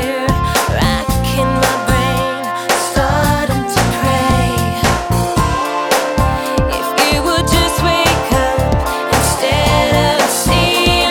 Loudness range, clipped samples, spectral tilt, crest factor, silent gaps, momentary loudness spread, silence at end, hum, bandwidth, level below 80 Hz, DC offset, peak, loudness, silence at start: 2 LU; under 0.1%; -4 dB/octave; 14 dB; none; 4 LU; 0 s; none; over 20 kHz; -24 dBFS; under 0.1%; 0 dBFS; -14 LUFS; 0 s